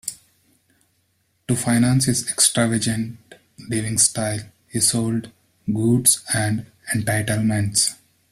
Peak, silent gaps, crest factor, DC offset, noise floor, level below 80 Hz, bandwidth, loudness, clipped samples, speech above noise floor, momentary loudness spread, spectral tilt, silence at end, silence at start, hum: -2 dBFS; none; 20 dB; under 0.1%; -67 dBFS; -52 dBFS; 16 kHz; -20 LUFS; under 0.1%; 46 dB; 12 LU; -3.5 dB/octave; 0.35 s; 0.05 s; none